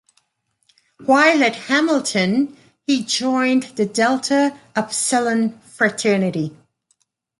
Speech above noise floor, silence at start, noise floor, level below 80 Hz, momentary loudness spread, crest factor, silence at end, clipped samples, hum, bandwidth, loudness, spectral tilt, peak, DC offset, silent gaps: 52 dB; 1 s; -70 dBFS; -66 dBFS; 11 LU; 18 dB; 0.85 s; under 0.1%; none; 11.5 kHz; -18 LUFS; -3.5 dB/octave; -2 dBFS; under 0.1%; none